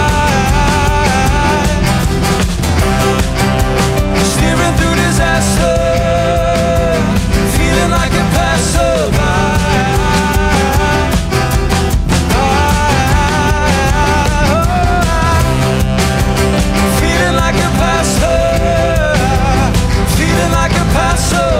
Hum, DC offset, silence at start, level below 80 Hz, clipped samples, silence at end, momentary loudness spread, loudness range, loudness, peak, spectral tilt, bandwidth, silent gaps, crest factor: none; under 0.1%; 0 s; -18 dBFS; under 0.1%; 0 s; 2 LU; 1 LU; -12 LUFS; 0 dBFS; -5 dB/octave; 16.5 kHz; none; 10 dB